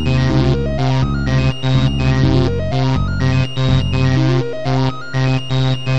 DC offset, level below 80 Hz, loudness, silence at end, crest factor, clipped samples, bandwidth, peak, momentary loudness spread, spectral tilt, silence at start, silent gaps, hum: 5%; -26 dBFS; -16 LUFS; 0 s; 12 dB; under 0.1%; 8 kHz; -2 dBFS; 3 LU; -7 dB/octave; 0 s; none; none